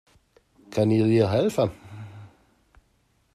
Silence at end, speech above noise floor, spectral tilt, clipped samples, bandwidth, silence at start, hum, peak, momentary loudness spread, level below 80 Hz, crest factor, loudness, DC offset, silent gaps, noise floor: 1.1 s; 45 dB; -7.5 dB/octave; under 0.1%; 13.5 kHz; 0.7 s; none; -8 dBFS; 22 LU; -60 dBFS; 18 dB; -23 LUFS; under 0.1%; none; -66 dBFS